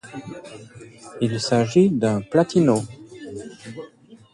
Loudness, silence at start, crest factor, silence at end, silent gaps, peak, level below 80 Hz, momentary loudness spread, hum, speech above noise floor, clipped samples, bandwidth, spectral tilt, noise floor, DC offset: -20 LUFS; 0.05 s; 18 dB; 0.2 s; none; -4 dBFS; -58 dBFS; 23 LU; none; 26 dB; under 0.1%; 11.5 kHz; -6.5 dB/octave; -47 dBFS; under 0.1%